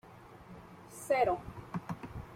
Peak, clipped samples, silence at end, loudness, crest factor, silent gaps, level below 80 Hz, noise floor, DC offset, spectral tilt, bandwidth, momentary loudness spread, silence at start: -16 dBFS; under 0.1%; 0 s; -35 LUFS; 20 dB; none; -58 dBFS; -54 dBFS; under 0.1%; -5.5 dB/octave; 16 kHz; 23 LU; 0.05 s